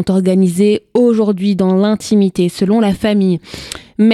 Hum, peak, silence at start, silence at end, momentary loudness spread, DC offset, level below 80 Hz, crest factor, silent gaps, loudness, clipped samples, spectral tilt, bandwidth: none; 0 dBFS; 0 s; 0 s; 6 LU; under 0.1%; -46 dBFS; 12 dB; none; -13 LUFS; under 0.1%; -7 dB/octave; 13 kHz